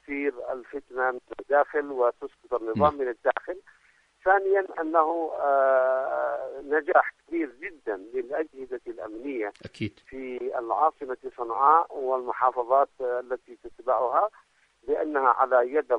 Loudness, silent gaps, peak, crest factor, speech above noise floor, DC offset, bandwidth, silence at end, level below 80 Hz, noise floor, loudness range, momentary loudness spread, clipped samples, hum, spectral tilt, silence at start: -26 LUFS; none; -6 dBFS; 22 dB; 35 dB; under 0.1%; 8.2 kHz; 0 s; -64 dBFS; -62 dBFS; 6 LU; 14 LU; under 0.1%; none; -7.5 dB/octave; 0.1 s